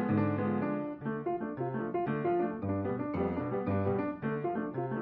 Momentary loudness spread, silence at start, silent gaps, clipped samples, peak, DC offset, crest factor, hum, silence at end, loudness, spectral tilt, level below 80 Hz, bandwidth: 5 LU; 0 s; none; under 0.1%; -18 dBFS; under 0.1%; 14 dB; none; 0 s; -34 LUFS; -8.5 dB/octave; -62 dBFS; 4.9 kHz